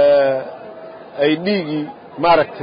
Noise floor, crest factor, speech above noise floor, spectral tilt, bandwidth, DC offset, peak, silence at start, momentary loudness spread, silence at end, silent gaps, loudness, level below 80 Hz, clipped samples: -35 dBFS; 14 dB; 18 dB; -10.5 dB/octave; 5.2 kHz; under 0.1%; -2 dBFS; 0 s; 20 LU; 0 s; none; -17 LUFS; -56 dBFS; under 0.1%